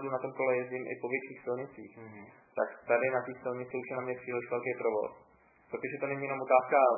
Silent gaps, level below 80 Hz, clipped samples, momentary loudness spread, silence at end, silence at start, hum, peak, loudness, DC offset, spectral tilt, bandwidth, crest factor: none; -78 dBFS; under 0.1%; 16 LU; 0 s; 0 s; none; -12 dBFS; -33 LUFS; under 0.1%; -0.5 dB/octave; 2.7 kHz; 22 dB